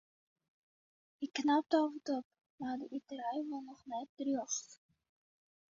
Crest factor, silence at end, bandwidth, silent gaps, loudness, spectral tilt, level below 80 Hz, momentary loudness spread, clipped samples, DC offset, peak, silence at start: 22 dB; 1 s; 7.4 kHz; 2.25-2.31 s, 2.50-2.58 s, 4.09-4.17 s; -38 LUFS; -2.5 dB/octave; -84 dBFS; 13 LU; under 0.1%; under 0.1%; -18 dBFS; 1.2 s